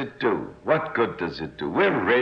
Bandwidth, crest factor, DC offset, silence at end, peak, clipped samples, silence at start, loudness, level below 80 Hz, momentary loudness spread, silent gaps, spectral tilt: 6.6 kHz; 16 dB; under 0.1%; 0 s; -8 dBFS; under 0.1%; 0 s; -25 LUFS; -56 dBFS; 9 LU; none; -7.5 dB/octave